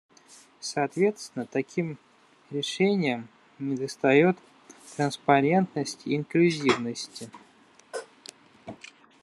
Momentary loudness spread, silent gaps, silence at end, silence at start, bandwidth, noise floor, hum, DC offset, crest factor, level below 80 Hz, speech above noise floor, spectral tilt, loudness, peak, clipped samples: 23 LU; none; 0.5 s; 0.6 s; 12.5 kHz; -58 dBFS; none; under 0.1%; 22 dB; -74 dBFS; 32 dB; -5.5 dB/octave; -26 LUFS; -6 dBFS; under 0.1%